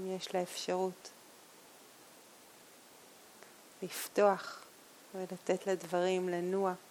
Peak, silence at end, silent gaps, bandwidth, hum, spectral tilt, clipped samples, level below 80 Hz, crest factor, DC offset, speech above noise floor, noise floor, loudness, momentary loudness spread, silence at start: -16 dBFS; 0 s; none; 18.5 kHz; none; -4.5 dB/octave; under 0.1%; -88 dBFS; 22 dB; under 0.1%; 24 dB; -58 dBFS; -35 LUFS; 25 LU; 0 s